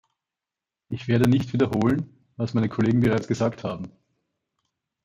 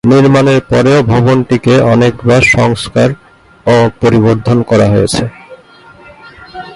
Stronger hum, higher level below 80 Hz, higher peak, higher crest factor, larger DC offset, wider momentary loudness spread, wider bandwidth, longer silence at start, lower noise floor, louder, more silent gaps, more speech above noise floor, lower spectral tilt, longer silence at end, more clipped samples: neither; second, -56 dBFS vs -36 dBFS; second, -8 dBFS vs 0 dBFS; first, 18 dB vs 10 dB; neither; first, 15 LU vs 9 LU; first, 15 kHz vs 11.5 kHz; first, 0.9 s vs 0.05 s; first, -89 dBFS vs -38 dBFS; second, -24 LUFS vs -9 LUFS; neither; first, 66 dB vs 30 dB; about the same, -7.5 dB/octave vs -6.5 dB/octave; first, 1.15 s vs 0 s; neither